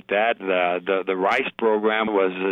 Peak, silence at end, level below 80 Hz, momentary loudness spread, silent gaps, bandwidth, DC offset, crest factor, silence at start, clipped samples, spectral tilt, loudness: -10 dBFS; 0 s; -68 dBFS; 1 LU; none; 7.8 kHz; under 0.1%; 12 dB; 0.1 s; under 0.1%; -6 dB/octave; -22 LUFS